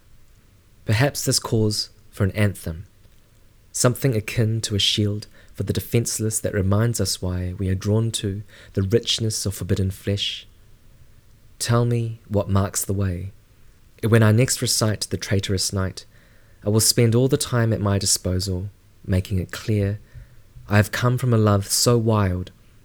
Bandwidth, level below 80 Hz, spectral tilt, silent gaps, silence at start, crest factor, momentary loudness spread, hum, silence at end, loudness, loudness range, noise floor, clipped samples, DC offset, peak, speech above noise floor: 19.5 kHz; -46 dBFS; -4.5 dB/octave; none; 0.85 s; 20 dB; 13 LU; none; 0.35 s; -22 LUFS; 4 LU; -52 dBFS; under 0.1%; under 0.1%; -2 dBFS; 31 dB